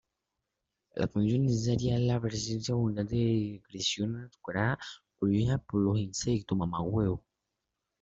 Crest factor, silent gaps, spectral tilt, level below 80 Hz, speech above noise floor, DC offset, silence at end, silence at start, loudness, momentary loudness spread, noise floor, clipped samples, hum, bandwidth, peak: 18 dB; none; -6 dB/octave; -54 dBFS; 56 dB; under 0.1%; 0.85 s; 0.95 s; -31 LUFS; 8 LU; -86 dBFS; under 0.1%; none; 8 kHz; -14 dBFS